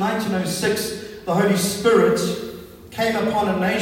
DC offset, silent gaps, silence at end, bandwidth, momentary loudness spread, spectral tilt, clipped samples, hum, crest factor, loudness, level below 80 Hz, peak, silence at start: under 0.1%; none; 0 s; 16.5 kHz; 14 LU; -4.5 dB/octave; under 0.1%; none; 18 dB; -20 LUFS; -54 dBFS; -4 dBFS; 0 s